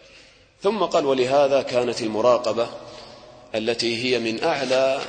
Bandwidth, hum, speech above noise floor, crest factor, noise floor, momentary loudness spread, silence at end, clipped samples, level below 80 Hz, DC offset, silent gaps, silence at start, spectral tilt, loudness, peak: 9.4 kHz; none; 30 dB; 16 dB; -51 dBFS; 10 LU; 0 s; under 0.1%; -60 dBFS; under 0.1%; none; 0.6 s; -4 dB/octave; -22 LUFS; -6 dBFS